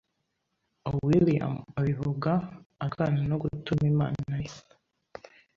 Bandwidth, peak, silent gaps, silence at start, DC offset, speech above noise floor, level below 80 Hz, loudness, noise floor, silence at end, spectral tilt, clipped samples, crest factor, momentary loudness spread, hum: 7.2 kHz; -12 dBFS; 2.66-2.70 s; 0.85 s; under 0.1%; 52 dB; -54 dBFS; -28 LUFS; -79 dBFS; 0.95 s; -8.5 dB/octave; under 0.1%; 18 dB; 19 LU; none